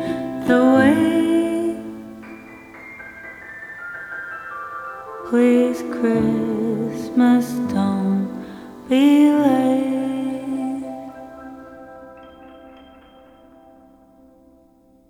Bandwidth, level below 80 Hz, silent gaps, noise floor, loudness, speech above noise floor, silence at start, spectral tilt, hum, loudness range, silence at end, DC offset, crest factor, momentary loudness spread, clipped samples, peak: 14 kHz; -56 dBFS; none; -54 dBFS; -19 LUFS; 38 dB; 0 s; -6.5 dB/octave; none; 15 LU; 2.4 s; under 0.1%; 18 dB; 23 LU; under 0.1%; -2 dBFS